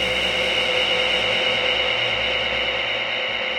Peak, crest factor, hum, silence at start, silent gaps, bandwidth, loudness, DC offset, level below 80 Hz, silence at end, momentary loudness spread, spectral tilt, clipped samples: -8 dBFS; 14 dB; none; 0 s; none; 16 kHz; -19 LUFS; under 0.1%; -46 dBFS; 0 s; 3 LU; -2 dB/octave; under 0.1%